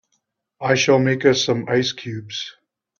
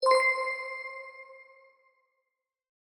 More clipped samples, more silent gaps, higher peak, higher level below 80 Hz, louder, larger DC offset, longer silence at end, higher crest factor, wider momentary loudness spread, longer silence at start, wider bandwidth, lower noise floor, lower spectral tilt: neither; neither; first, -2 dBFS vs -12 dBFS; first, -60 dBFS vs under -90 dBFS; first, -19 LUFS vs -28 LUFS; neither; second, 0.5 s vs 1.4 s; about the same, 18 dB vs 20 dB; second, 14 LU vs 24 LU; first, 0.6 s vs 0 s; second, 7.4 kHz vs 17 kHz; second, -72 dBFS vs -84 dBFS; first, -4.5 dB/octave vs 1.5 dB/octave